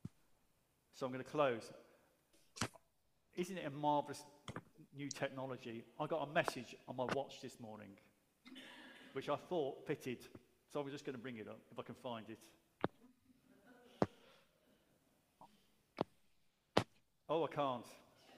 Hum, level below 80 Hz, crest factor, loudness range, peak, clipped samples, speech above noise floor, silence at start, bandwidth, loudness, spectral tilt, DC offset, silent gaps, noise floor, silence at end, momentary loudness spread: none; -80 dBFS; 32 dB; 7 LU; -14 dBFS; under 0.1%; 37 dB; 0.05 s; 15.5 kHz; -44 LUFS; -5 dB/octave; under 0.1%; none; -81 dBFS; 0 s; 19 LU